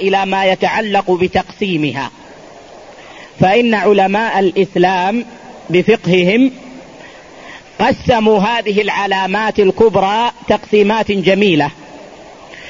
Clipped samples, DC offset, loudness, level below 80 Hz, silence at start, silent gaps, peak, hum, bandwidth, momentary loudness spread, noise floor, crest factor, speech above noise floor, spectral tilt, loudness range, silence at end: under 0.1%; 0.2%; -13 LUFS; -46 dBFS; 0 s; none; 0 dBFS; none; 7.6 kHz; 18 LU; -37 dBFS; 14 dB; 24 dB; -6 dB/octave; 3 LU; 0 s